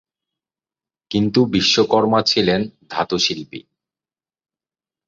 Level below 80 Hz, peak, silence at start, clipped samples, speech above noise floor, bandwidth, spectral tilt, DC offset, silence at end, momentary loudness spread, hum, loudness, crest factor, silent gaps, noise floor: -54 dBFS; -2 dBFS; 1.1 s; under 0.1%; over 72 dB; 7.8 kHz; -4.5 dB/octave; under 0.1%; 1.5 s; 12 LU; none; -17 LUFS; 18 dB; none; under -90 dBFS